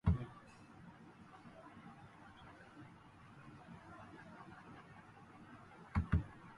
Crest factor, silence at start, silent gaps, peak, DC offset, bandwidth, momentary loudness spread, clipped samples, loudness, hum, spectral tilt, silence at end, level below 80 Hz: 26 dB; 0.05 s; none; -20 dBFS; under 0.1%; 10.5 kHz; 20 LU; under 0.1%; -47 LUFS; none; -8.5 dB/octave; 0 s; -50 dBFS